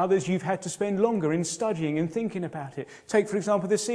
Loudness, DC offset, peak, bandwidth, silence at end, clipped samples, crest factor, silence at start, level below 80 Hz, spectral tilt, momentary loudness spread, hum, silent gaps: -27 LUFS; under 0.1%; -8 dBFS; 11 kHz; 0 s; under 0.1%; 18 dB; 0 s; -70 dBFS; -5.5 dB/octave; 9 LU; none; none